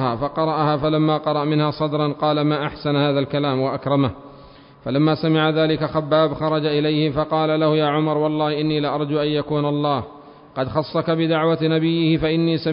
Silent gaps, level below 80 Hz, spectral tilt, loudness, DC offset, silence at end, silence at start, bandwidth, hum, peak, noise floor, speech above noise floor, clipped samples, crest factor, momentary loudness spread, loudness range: none; -50 dBFS; -12 dB/octave; -20 LUFS; under 0.1%; 0 s; 0 s; 5.4 kHz; none; -4 dBFS; -44 dBFS; 25 dB; under 0.1%; 16 dB; 4 LU; 2 LU